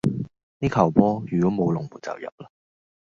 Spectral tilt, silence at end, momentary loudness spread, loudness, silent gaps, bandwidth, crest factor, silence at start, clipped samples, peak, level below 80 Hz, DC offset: -8.5 dB/octave; 0.6 s; 17 LU; -23 LUFS; 0.43-0.60 s, 2.32-2.38 s; 7.6 kHz; 22 dB; 0.05 s; under 0.1%; -2 dBFS; -50 dBFS; under 0.1%